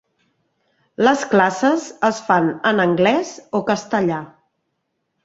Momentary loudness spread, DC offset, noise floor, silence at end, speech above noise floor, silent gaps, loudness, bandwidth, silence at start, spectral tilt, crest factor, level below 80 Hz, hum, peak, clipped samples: 8 LU; under 0.1%; -73 dBFS; 0.95 s; 55 dB; none; -18 LUFS; 8 kHz; 1 s; -5 dB/octave; 18 dB; -62 dBFS; none; -2 dBFS; under 0.1%